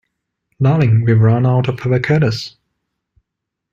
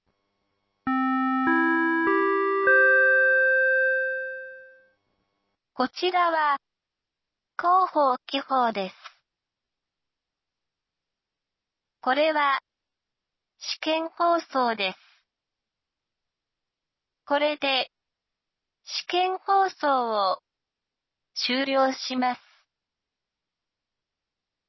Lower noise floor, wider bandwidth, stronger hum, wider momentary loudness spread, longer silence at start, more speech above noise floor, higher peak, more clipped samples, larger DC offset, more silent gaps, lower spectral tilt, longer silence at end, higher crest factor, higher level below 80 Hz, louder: second, -79 dBFS vs -87 dBFS; first, 7.2 kHz vs 6.2 kHz; neither; second, 6 LU vs 14 LU; second, 0.6 s vs 0.85 s; about the same, 66 dB vs 63 dB; first, -2 dBFS vs -10 dBFS; neither; neither; neither; first, -8 dB/octave vs -3 dB/octave; second, 1.25 s vs 2.3 s; about the same, 14 dB vs 18 dB; first, -48 dBFS vs -76 dBFS; first, -15 LUFS vs -23 LUFS